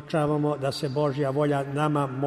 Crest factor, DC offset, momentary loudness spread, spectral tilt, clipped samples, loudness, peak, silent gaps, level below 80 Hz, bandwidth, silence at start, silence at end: 14 dB; under 0.1%; 3 LU; -7 dB/octave; under 0.1%; -26 LUFS; -12 dBFS; none; -60 dBFS; 13 kHz; 0 s; 0 s